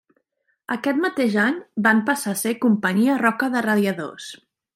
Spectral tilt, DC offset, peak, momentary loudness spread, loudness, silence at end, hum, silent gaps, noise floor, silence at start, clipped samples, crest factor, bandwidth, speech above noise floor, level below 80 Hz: -5 dB/octave; under 0.1%; -4 dBFS; 12 LU; -21 LUFS; 0.4 s; none; none; -72 dBFS; 0.7 s; under 0.1%; 18 dB; 16 kHz; 51 dB; -72 dBFS